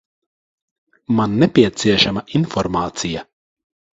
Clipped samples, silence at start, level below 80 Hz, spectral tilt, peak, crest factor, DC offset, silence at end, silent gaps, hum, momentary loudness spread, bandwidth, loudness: under 0.1%; 1.1 s; -46 dBFS; -5 dB/octave; 0 dBFS; 18 dB; under 0.1%; 0.7 s; none; none; 10 LU; 8 kHz; -17 LUFS